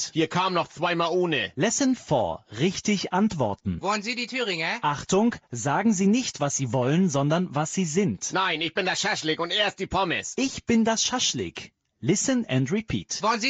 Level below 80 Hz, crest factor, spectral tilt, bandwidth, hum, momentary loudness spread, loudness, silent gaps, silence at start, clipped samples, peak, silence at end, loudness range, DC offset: -54 dBFS; 14 dB; -4 dB/octave; 9 kHz; none; 5 LU; -25 LUFS; none; 0 s; under 0.1%; -10 dBFS; 0 s; 2 LU; under 0.1%